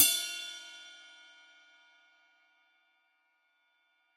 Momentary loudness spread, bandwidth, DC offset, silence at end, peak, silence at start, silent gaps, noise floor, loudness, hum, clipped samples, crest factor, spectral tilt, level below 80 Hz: 26 LU; 14.5 kHz; under 0.1%; 3.2 s; -6 dBFS; 0 s; none; -75 dBFS; -31 LUFS; none; under 0.1%; 32 dB; 3.5 dB/octave; -86 dBFS